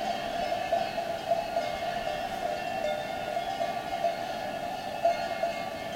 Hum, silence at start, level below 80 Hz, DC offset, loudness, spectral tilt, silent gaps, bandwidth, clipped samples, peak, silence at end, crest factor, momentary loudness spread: none; 0 s; -56 dBFS; under 0.1%; -32 LUFS; -4 dB/octave; none; 16 kHz; under 0.1%; -14 dBFS; 0 s; 18 dB; 5 LU